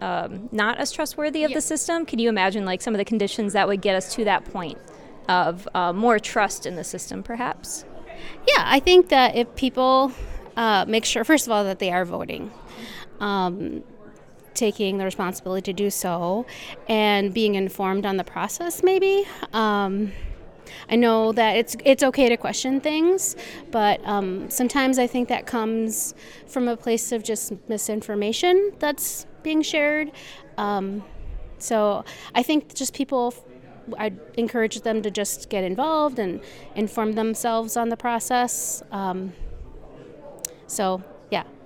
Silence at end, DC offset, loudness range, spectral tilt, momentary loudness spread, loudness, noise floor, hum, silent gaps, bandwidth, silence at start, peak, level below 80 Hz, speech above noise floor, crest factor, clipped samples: 0 s; under 0.1%; 6 LU; -3.5 dB/octave; 15 LU; -23 LUFS; -46 dBFS; none; none; 18 kHz; 0 s; -4 dBFS; -46 dBFS; 23 dB; 20 dB; under 0.1%